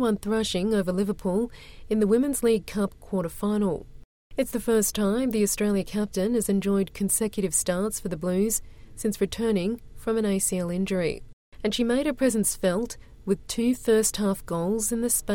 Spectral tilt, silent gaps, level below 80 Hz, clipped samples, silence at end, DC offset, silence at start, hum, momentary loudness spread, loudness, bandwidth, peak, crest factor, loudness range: -4.5 dB/octave; 4.05-4.30 s, 11.33-11.52 s; -46 dBFS; under 0.1%; 0 s; under 0.1%; 0 s; none; 8 LU; -26 LUFS; 17 kHz; -10 dBFS; 16 dB; 2 LU